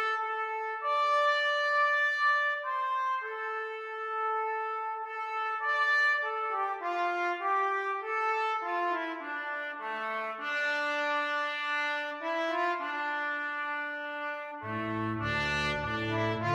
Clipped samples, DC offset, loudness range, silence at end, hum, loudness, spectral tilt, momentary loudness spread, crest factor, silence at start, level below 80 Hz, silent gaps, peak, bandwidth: under 0.1%; under 0.1%; 5 LU; 0 s; none; -30 LUFS; -4.5 dB/octave; 10 LU; 14 dB; 0 s; -60 dBFS; none; -18 dBFS; 15 kHz